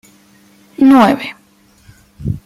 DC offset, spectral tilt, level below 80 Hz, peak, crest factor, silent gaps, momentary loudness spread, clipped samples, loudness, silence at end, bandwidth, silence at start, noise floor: under 0.1%; -7 dB/octave; -42 dBFS; 0 dBFS; 14 dB; none; 19 LU; under 0.1%; -11 LUFS; 0.1 s; 13.5 kHz; 0.8 s; -49 dBFS